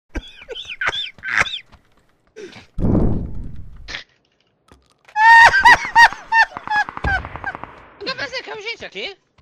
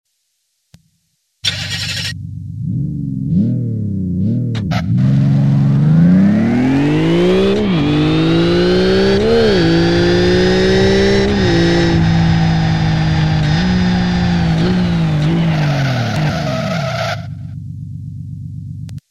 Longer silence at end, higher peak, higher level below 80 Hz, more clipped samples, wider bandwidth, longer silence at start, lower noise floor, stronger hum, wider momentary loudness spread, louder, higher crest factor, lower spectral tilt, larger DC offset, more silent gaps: first, 0.3 s vs 0.1 s; about the same, 0 dBFS vs -2 dBFS; about the same, -34 dBFS vs -30 dBFS; neither; first, 14.5 kHz vs 11 kHz; second, 0.15 s vs 1.45 s; second, -63 dBFS vs -67 dBFS; neither; first, 23 LU vs 14 LU; about the same, -14 LUFS vs -14 LUFS; first, 18 dB vs 12 dB; second, -3.5 dB/octave vs -7 dB/octave; second, under 0.1% vs 0.7%; neither